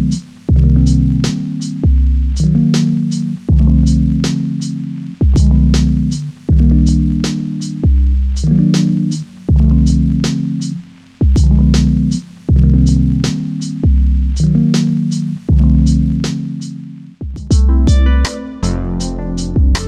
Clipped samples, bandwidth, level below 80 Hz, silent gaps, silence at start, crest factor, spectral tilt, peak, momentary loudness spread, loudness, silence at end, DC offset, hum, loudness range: under 0.1%; 9.8 kHz; -16 dBFS; none; 0 s; 12 dB; -7 dB/octave; 0 dBFS; 10 LU; -14 LUFS; 0 s; under 0.1%; none; 2 LU